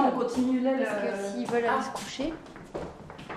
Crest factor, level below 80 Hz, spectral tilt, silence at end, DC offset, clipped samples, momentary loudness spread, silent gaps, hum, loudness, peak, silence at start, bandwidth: 18 dB; -56 dBFS; -5 dB/octave; 0 s; under 0.1%; under 0.1%; 15 LU; none; none; -29 LUFS; -12 dBFS; 0 s; 13 kHz